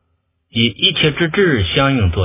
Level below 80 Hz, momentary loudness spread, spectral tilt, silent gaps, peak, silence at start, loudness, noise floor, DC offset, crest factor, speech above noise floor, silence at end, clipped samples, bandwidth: -30 dBFS; 4 LU; -10 dB/octave; none; 0 dBFS; 0.55 s; -14 LUFS; -66 dBFS; under 0.1%; 16 dB; 51 dB; 0 s; under 0.1%; 3.9 kHz